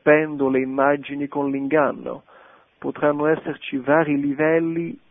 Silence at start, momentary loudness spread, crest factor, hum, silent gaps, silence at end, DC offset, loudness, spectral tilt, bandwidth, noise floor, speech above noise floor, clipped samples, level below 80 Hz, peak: 0.05 s; 12 LU; 18 dB; none; none; 0.15 s; under 0.1%; -21 LUFS; -11.5 dB/octave; 3.8 kHz; -51 dBFS; 30 dB; under 0.1%; -62 dBFS; -2 dBFS